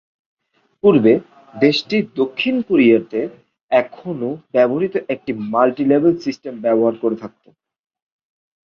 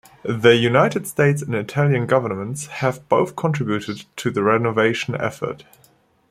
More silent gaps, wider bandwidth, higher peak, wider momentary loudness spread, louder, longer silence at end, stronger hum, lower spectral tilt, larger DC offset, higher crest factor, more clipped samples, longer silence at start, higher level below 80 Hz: first, 3.61-3.69 s vs none; second, 7 kHz vs 15 kHz; about the same, -2 dBFS vs -2 dBFS; about the same, 12 LU vs 12 LU; first, -17 LUFS vs -20 LUFS; first, 1.35 s vs 0.7 s; neither; about the same, -7 dB/octave vs -6 dB/octave; neither; about the same, 16 dB vs 18 dB; neither; first, 0.85 s vs 0.25 s; about the same, -60 dBFS vs -58 dBFS